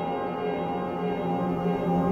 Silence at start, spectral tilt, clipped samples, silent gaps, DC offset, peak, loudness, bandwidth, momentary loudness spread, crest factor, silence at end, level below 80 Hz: 0 s; -9 dB/octave; under 0.1%; none; under 0.1%; -14 dBFS; -28 LUFS; 6.4 kHz; 4 LU; 14 dB; 0 s; -54 dBFS